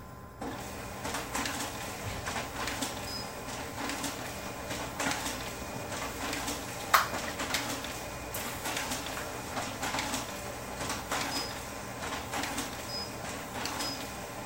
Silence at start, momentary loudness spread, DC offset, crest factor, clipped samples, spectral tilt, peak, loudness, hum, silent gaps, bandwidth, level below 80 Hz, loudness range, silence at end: 0 s; 7 LU; under 0.1%; 30 dB; under 0.1%; -2.5 dB/octave; -6 dBFS; -35 LUFS; none; none; 16.5 kHz; -52 dBFS; 4 LU; 0 s